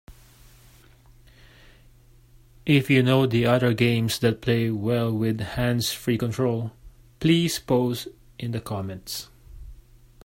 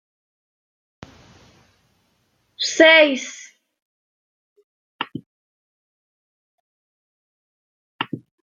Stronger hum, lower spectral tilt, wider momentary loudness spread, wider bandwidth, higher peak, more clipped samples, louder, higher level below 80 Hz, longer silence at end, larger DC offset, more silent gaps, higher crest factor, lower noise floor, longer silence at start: neither; first, -6 dB/octave vs -2.5 dB/octave; second, 14 LU vs 26 LU; first, 16.5 kHz vs 7.6 kHz; second, -6 dBFS vs -2 dBFS; neither; second, -24 LUFS vs -16 LUFS; first, -50 dBFS vs -70 dBFS; first, 0.5 s vs 0.35 s; neither; second, none vs 3.82-4.56 s, 4.64-4.99 s, 5.26-7.99 s; second, 18 dB vs 24 dB; second, -53 dBFS vs -67 dBFS; second, 0.1 s vs 2.6 s